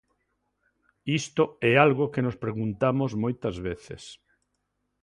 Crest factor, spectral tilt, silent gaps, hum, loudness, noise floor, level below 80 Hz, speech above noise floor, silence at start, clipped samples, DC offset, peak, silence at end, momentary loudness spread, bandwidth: 24 dB; -6 dB/octave; none; 50 Hz at -50 dBFS; -26 LUFS; -78 dBFS; -56 dBFS; 52 dB; 1.05 s; under 0.1%; under 0.1%; -4 dBFS; 0.9 s; 18 LU; 11 kHz